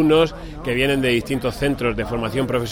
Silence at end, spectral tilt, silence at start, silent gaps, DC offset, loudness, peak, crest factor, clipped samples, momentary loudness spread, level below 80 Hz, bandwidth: 0 s; -6 dB/octave; 0 s; none; under 0.1%; -21 LUFS; -6 dBFS; 14 dB; under 0.1%; 6 LU; -36 dBFS; 16.5 kHz